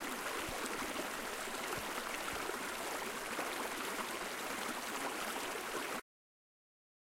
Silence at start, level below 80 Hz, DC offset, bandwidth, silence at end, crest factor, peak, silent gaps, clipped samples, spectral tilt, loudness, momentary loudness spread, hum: 0 s; -66 dBFS; under 0.1%; 16.5 kHz; 1 s; 18 dB; -24 dBFS; none; under 0.1%; -1.5 dB/octave; -40 LUFS; 1 LU; none